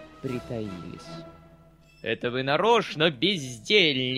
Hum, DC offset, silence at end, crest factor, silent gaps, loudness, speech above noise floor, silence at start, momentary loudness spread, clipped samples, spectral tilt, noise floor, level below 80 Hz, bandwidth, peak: none; under 0.1%; 0 s; 20 dB; none; -24 LUFS; 29 dB; 0 s; 20 LU; under 0.1%; -4.5 dB/octave; -54 dBFS; -58 dBFS; 13.5 kHz; -6 dBFS